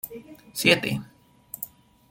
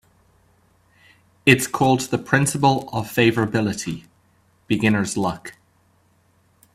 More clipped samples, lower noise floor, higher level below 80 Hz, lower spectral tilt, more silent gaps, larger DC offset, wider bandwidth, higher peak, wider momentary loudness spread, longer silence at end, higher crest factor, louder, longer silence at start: neither; second, -46 dBFS vs -60 dBFS; second, -60 dBFS vs -54 dBFS; second, -3.5 dB/octave vs -5 dB/octave; neither; neither; about the same, 17 kHz vs 15.5 kHz; second, -4 dBFS vs 0 dBFS; first, 20 LU vs 12 LU; second, 0.45 s vs 1.25 s; about the same, 24 dB vs 22 dB; about the same, -22 LUFS vs -20 LUFS; second, 0.05 s vs 1.45 s